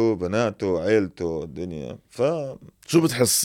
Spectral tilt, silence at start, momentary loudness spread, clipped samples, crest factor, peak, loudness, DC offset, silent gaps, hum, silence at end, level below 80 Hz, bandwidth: -4.5 dB/octave; 0 s; 15 LU; under 0.1%; 20 dB; -4 dBFS; -24 LUFS; under 0.1%; none; none; 0 s; -56 dBFS; 17.5 kHz